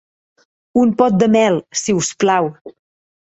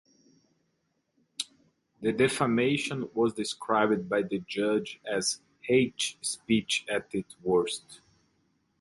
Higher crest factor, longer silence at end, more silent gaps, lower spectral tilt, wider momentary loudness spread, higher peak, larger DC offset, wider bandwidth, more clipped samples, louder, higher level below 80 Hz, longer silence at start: second, 14 dB vs 20 dB; second, 0.55 s vs 0.85 s; first, 2.61-2.65 s vs none; about the same, -5 dB/octave vs -4 dB/octave; second, 6 LU vs 11 LU; first, -2 dBFS vs -10 dBFS; neither; second, 8.2 kHz vs 11.5 kHz; neither; first, -16 LUFS vs -29 LUFS; first, -56 dBFS vs -66 dBFS; second, 0.75 s vs 1.4 s